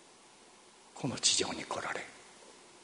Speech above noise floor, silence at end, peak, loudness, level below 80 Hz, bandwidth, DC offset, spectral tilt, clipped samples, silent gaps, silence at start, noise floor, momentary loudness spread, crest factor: 25 dB; 0 s; -14 dBFS; -32 LUFS; -72 dBFS; 10.5 kHz; under 0.1%; -1.5 dB/octave; under 0.1%; none; 0 s; -59 dBFS; 26 LU; 24 dB